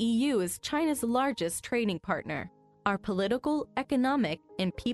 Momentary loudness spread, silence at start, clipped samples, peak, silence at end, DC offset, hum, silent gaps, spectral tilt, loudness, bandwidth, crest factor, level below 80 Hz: 6 LU; 0 s; under 0.1%; -14 dBFS; 0 s; under 0.1%; none; none; -4.5 dB/octave; -30 LUFS; 12 kHz; 16 dB; -58 dBFS